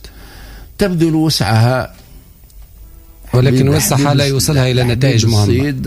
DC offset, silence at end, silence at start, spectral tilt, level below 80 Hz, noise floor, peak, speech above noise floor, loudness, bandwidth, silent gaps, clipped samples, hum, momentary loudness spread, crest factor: under 0.1%; 0 s; 0.05 s; -5.5 dB/octave; -34 dBFS; -39 dBFS; -2 dBFS; 27 dB; -13 LUFS; 16 kHz; none; under 0.1%; none; 6 LU; 12 dB